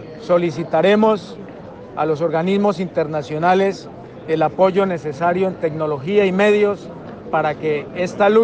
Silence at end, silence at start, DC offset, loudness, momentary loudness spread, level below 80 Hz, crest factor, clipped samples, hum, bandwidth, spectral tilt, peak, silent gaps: 0 s; 0 s; under 0.1%; -18 LUFS; 18 LU; -56 dBFS; 14 dB; under 0.1%; none; 8.8 kHz; -7 dB/octave; -4 dBFS; none